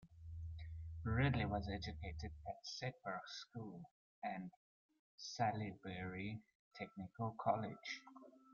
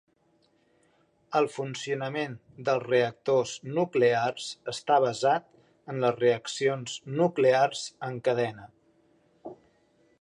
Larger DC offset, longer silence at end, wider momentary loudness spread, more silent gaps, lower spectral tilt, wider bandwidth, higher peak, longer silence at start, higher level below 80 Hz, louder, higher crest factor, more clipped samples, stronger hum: neither; second, 0 s vs 0.7 s; about the same, 14 LU vs 12 LU; first, 3.91-4.22 s, 4.56-4.89 s, 4.99-5.18 s, 6.55-6.71 s vs none; about the same, -5 dB/octave vs -5 dB/octave; second, 7.2 kHz vs 11 kHz; second, -24 dBFS vs -10 dBFS; second, 0 s vs 1.3 s; first, -62 dBFS vs -74 dBFS; second, -45 LUFS vs -28 LUFS; about the same, 22 dB vs 18 dB; neither; neither